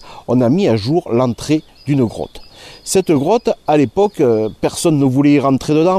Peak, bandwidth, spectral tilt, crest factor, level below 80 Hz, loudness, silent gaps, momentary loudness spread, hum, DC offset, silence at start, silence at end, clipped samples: -2 dBFS; 14.5 kHz; -6.5 dB/octave; 12 dB; -46 dBFS; -15 LUFS; none; 7 LU; none; under 0.1%; 0.05 s; 0 s; under 0.1%